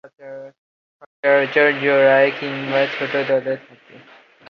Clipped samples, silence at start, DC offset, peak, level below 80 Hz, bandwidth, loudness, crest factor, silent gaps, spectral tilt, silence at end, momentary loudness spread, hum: under 0.1%; 0.05 s; under 0.1%; -2 dBFS; -70 dBFS; 6.4 kHz; -17 LUFS; 18 dB; 0.58-1.00 s, 1.06-1.23 s; -6.5 dB/octave; 0.55 s; 22 LU; none